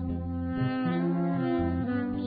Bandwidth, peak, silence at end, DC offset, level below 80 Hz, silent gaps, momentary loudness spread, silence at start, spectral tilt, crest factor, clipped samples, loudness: 4.9 kHz; -18 dBFS; 0 s; under 0.1%; -42 dBFS; none; 5 LU; 0 s; -12 dB/octave; 10 dB; under 0.1%; -29 LUFS